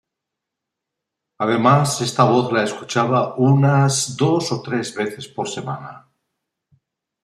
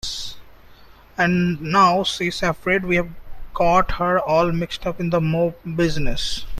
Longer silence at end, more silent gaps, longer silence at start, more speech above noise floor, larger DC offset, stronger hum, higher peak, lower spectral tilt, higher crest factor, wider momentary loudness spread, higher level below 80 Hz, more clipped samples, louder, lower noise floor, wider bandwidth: first, 1.25 s vs 0 s; neither; first, 1.4 s vs 0.05 s; first, 64 dB vs 26 dB; neither; neither; about the same, -2 dBFS vs -2 dBFS; about the same, -5.5 dB/octave vs -5.5 dB/octave; about the same, 18 dB vs 18 dB; about the same, 12 LU vs 11 LU; second, -62 dBFS vs -34 dBFS; neither; about the same, -18 LUFS vs -20 LUFS; first, -83 dBFS vs -46 dBFS; about the same, 13 kHz vs 13 kHz